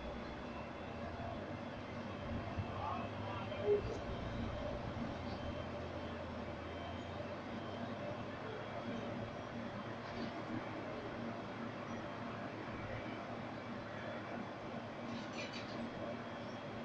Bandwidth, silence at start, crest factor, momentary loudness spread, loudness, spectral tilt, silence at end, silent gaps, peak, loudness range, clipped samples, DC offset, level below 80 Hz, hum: 9 kHz; 0 s; 20 dB; 4 LU; -44 LUFS; -6.5 dB/octave; 0 s; none; -24 dBFS; 4 LU; under 0.1%; under 0.1%; -60 dBFS; none